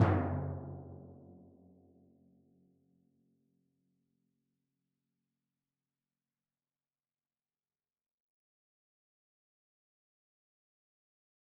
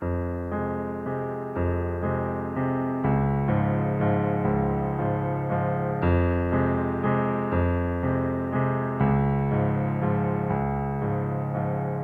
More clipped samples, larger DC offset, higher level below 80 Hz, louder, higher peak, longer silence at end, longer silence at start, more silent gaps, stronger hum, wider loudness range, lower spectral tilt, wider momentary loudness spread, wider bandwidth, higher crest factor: neither; neither; second, -68 dBFS vs -40 dBFS; second, -37 LUFS vs -26 LUFS; second, -14 dBFS vs -10 dBFS; first, 10.15 s vs 0 s; about the same, 0 s vs 0 s; neither; neither; first, 24 LU vs 2 LU; second, -7 dB/octave vs -11 dB/octave; first, 25 LU vs 5 LU; second, 2.5 kHz vs 3.7 kHz; first, 28 dB vs 14 dB